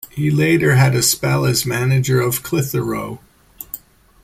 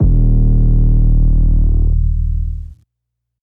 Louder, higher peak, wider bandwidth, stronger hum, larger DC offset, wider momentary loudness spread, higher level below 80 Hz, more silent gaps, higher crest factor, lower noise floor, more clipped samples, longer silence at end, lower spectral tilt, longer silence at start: about the same, -16 LUFS vs -15 LUFS; about the same, -2 dBFS vs -2 dBFS; first, 16.5 kHz vs 1.1 kHz; neither; neither; first, 18 LU vs 8 LU; second, -46 dBFS vs -12 dBFS; neither; first, 14 dB vs 8 dB; second, -37 dBFS vs -76 dBFS; neither; second, 0.45 s vs 0.75 s; second, -5 dB/octave vs -13 dB/octave; about the same, 0.05 s vs 0 s